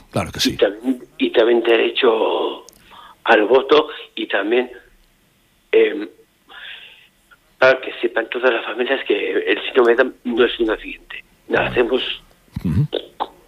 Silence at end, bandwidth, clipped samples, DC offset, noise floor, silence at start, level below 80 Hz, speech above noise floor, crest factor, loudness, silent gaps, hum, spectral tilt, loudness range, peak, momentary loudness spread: 0.2 s; 15 kHz; under 0.1%; under 0.1%; -58 dBFS; 0.15 s; -48 dBFS; 41 dB; 18 dB; -18 LUFS; none; none; -5 dB/octave; 4 LU; -2 dBFS; 16 LU